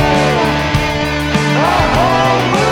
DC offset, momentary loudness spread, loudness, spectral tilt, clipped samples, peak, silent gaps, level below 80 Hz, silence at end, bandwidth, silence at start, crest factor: under 0.1%; 3 LU; -13 LUFS; -5 dB/octave; under 0.1%; 0 dBFS; none; -26 dBFS; 0 s; 18 kHz; 0 s; 12 dB